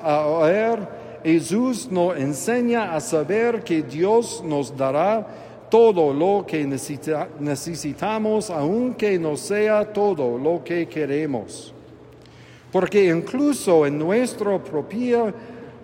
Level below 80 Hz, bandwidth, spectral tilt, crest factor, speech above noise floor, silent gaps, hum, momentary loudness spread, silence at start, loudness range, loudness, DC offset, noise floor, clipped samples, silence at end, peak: -62 dBFS; 16.5 kHz; -5.5 dB/octave; 16 dB; 25 dB; none; none; 9 LU; 0 s; 3 LU; -21 LUFS; under 0.1%; -45 dBFS; under 0.1%; 0 s; -4 dBFS